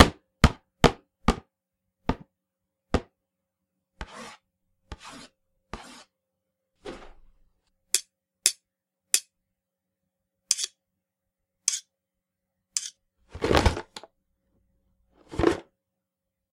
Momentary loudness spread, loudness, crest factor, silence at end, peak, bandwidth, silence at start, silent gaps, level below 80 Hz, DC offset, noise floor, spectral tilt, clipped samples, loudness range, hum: 21 LU; -27 LUFS; 30 dB; 0.9 s; 0 dBFS; 16 kHz; 0 s; none; -40 dBFS; under 0.1%; -85 dBFS; -3.5 dB/octave; under 0.1%; 17 LU; none